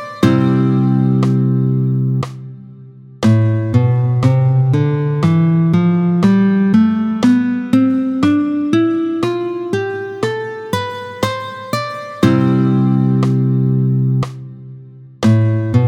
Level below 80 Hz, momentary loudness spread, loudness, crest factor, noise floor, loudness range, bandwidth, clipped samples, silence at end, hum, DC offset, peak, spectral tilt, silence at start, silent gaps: -52 dBFS; 9 LU; -15 LUFS; 14 dB; -37 dBFS; 5 LU; 12 kHz; under 0.1%; 0 s; none; under 0.1%; 0 dBFS; -8 dB/octave; 0 s; none